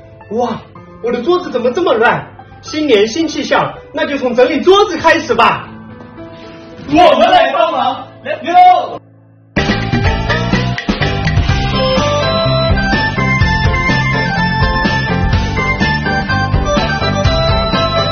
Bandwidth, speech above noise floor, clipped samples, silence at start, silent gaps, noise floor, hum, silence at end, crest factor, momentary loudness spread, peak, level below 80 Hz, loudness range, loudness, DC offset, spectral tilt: 7.6 kHz; 32 dB; 0.2%; 0.05 s; none; -43 dBFS; none; 0 s; 12 dB; 14 LU; 0 dBFS; -24 dBFS; 3 LU; -12 LUFS; under 0.1%; -5.5 dB/octave